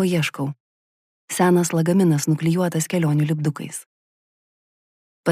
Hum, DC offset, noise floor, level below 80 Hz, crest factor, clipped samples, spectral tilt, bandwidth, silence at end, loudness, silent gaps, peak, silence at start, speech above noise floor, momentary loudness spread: none; under 0.1%; under -90 dBFS; -66 dBFS; 16 dB; under 0.1%; -6 dB/octave; 15.5 kHz; 0 s; -20 LUFS; 0.60-1.28 s, 3.86-5.23 s; -6 dBFS; 0 s; over 70 dB; 13 LU